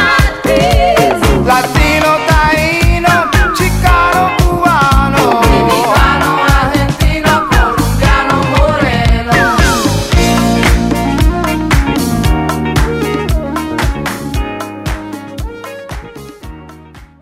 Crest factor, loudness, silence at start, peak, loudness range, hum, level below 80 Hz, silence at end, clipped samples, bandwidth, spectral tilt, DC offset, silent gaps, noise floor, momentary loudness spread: 10 dB; -11 LUFS; 0 s; 0 dBFS; 8 LU; none; -16 dBFS; 0.15 s; under 0.1%; 16 kHz; -5 dB/octave; under 0.1%; none; -35 dBFS; 12 LU